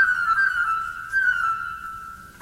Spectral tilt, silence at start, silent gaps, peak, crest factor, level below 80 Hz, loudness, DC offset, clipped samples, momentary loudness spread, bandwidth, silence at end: -1.5 dB/octave; 0 s; none; -10 dBFS; 14 dB; -54 dBFS; -22 LUFS; under 0.1%; under 0.1%; 16 LU; 16 kHz; 0 s